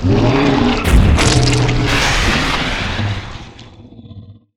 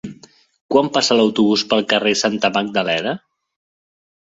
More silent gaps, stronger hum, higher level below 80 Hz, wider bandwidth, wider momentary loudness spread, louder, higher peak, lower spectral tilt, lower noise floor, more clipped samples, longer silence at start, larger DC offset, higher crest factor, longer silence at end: second, none vs 0.61-0.69 s; neither; first, -20 dBFS vs -60 dBFS; first, 16 kHz vs 8 kHz; first, 10 LU vs 7 LU; first, -14 LUFS vs -17 LUFS; about the same, 0 dBFS vs -2 dBFS; first, -5 dB/octave vs -3.5 dB/octave; second, -37 dBFS vs -45 dBFS; neither; about the same, 0 s vs 0.05 s; neither; about the same, 14 dB vs 18 dB; second, 0.25 s vs 1.15 s